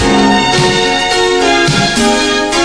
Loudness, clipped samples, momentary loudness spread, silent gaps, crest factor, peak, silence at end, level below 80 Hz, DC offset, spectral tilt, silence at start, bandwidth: -10 LUFS; under 0.1%; 2 LU; none; 10 dB; 0 dBFS; 0 s; -30 dBFS; under 0.1%; -3.5 dB/octave; 0 s; 11 kHz